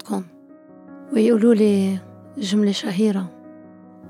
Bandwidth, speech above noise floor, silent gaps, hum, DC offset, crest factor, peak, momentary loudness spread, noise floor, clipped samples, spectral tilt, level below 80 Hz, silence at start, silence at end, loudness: 13.5 kHz; 28 dB; none; none; under 0.1%; 16 dB; -4 dBFS; 16 LU; -46 dBFS; under 0.1%; -6.5 dB/octave; -76 dBFS; 0.05 s; 0 s; -20 LUFS